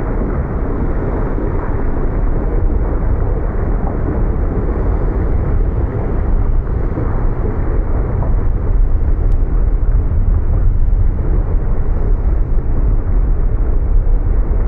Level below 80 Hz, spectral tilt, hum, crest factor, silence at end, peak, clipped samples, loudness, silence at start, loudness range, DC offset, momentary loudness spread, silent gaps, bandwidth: -14 dBFS; -12 dB/octave; none; 10 dB; 0 s; -2 dBFS; under 0.1%; -19 LUFS; 0 s; 2 LU; under 0.1%; 2 LU; none; 2.5 kHz